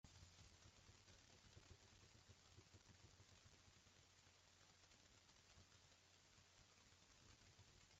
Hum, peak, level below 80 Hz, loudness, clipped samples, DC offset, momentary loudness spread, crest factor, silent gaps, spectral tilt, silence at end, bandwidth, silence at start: none; -50 dBFS; -82 dBFS; -69 LUFS; under 0.1%; under 0.1%; 2 LU; 20 dB; none; -3 dB/octave; 0 s; 8 kHz; 0.05 s